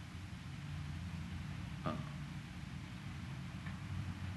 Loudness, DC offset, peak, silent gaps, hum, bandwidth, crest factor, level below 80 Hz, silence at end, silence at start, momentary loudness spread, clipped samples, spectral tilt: -46 LUFS; under 0.1%; -26 dBFS; none; none; 12 kHz; 18 dB; -56 dBFS; 0 s; 0 s; 5 LU; under 0.1%; -6 dB/octave